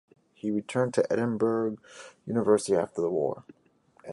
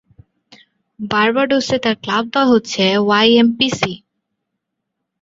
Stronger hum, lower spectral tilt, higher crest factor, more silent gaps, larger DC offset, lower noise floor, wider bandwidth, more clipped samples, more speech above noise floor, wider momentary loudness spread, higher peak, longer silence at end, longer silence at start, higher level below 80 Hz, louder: neither; first, -6 dB/octave vs -4.5 dB/octave; about the same, 18 dB vs 16 dB; neither; neither; second, -60 dBFS vs -77 dBFS; first, 11.5 kHz vs 7.8 kHz; neither; second, 32 dB vs 62 dB; first, 18 LU vs 9 LU; second, -10 dBFS vs 0 dBFS; second, 0 s vs 1.25 s; second, 0.45 s vs 1 s; second, -68 dBFS vs -56 dBFS; second, -28 LUFS vs -15 LUFS